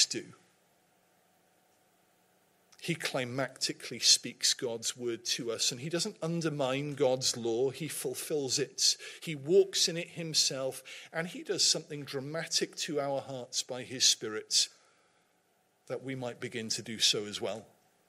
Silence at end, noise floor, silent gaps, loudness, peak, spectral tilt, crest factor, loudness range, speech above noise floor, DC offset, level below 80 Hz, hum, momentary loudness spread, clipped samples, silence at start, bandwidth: 0.45 s; -72 dBFS; none; -31 LUFS; -10 dBFS; -2 dB/octave; 24 dB; 5 LU; 39 dB; under 0.1%; -82 dBFS; none; 13 LU; under 0.1%; 0 s; 16 kHz